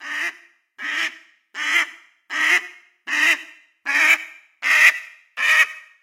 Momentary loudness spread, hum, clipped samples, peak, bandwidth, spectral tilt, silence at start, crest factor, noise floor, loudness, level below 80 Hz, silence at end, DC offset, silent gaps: 17 LU; none; under 0.1%; 0 dBFS; 16 kHz; 3.5 dB/octave; 0 s; 22 dB; -47 dBFS; -18 LUFS; under -90 dBFS; 0.25 s; under 0.1%; none